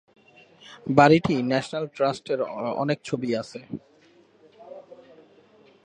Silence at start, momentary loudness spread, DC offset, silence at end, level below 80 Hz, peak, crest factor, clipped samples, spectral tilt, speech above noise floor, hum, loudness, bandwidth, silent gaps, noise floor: 0.7 s; 24 LU; under 0.1%; 0.9 s; -62 dBFS; -2 dBFS; 24 dB; under 0.1%; -6.5 dB/octave; 34 dB; none; -23 LUFS; 10 kHz; none; -57 dBFS